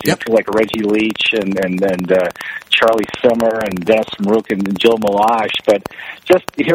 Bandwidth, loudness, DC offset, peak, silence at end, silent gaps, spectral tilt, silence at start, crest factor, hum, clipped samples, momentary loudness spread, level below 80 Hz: 17 kHz; -15 LUFS; under 0.1%; 0 dBFS; 0 s; none; -5 dB/octave; 0 s; 14 dB; none; under 0.1%; 5 LU; -52 dBFS